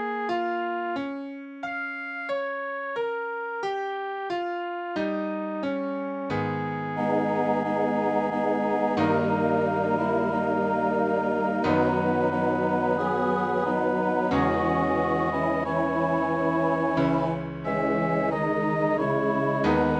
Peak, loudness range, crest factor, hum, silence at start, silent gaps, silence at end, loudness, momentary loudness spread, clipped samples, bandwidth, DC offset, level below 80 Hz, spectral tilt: -10 dBFS; 6 LU; 16 dB; none; 0 s; none; 0 s; -26 LUFS; 7 LU; under 0.1%; 9.2 kHz; under 0.1%; -56 dBFS; -8 dB/octave